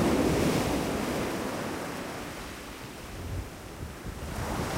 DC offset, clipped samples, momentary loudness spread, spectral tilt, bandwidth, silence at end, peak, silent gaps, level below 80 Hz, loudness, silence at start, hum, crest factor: under 0.1%; under 0.1%; 15 LU; -5 dB/octave; 16 kHz; 0 s; -14 dBFS; none; -44 dBFS; -32 LUFS; 0 s; none; 18 dB